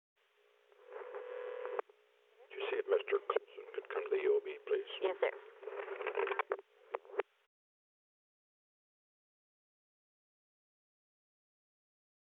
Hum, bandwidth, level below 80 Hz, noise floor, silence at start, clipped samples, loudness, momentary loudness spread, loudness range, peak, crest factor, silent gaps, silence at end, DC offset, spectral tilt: none; 4 kHz; under -90 dBFS; -72 dBFS; 0.8 s; under 0.1%; -39 LUFS; 13 LU; 10 LU; -18 dBFS; 24 dB; none; 5.05 s; under 0.1%; -4 dB/octave